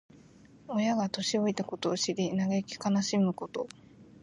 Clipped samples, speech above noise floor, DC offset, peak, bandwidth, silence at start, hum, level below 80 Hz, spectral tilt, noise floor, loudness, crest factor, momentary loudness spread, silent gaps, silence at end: under 0.1%; 26 dB; under 0.1%; -16 dBFS; 11 kHz; 0.65 s; none; -70 dBFS; -5 dB/octave; -56 dBFS; -31 LUFS; 14 dB; 8 LU; none; 0.2 s